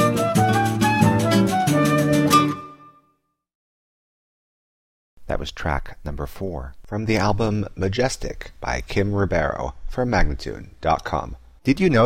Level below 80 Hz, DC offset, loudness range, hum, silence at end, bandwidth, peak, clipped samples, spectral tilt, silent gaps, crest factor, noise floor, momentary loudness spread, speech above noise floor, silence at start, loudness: -34 dBFS; under 0.1%; 13 LU; none; 0 s; 16.5 kHz; -4 dBFS; under 0.1%; -6 dB/octave; 3.55-5.17 s; 18 dB; -68 dBFS; 14 LU; 46 dB; 0 s; -22 LUFS